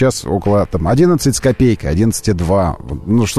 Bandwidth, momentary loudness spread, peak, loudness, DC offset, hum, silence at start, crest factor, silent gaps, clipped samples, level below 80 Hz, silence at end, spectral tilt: 13.5 kHz; 5 LU; -2 dBFS; -14 LUFS; 1%; none; 0 s; 12 dB; none; under 0.1%; -30 dBFS; 0 s; -6 dB/octave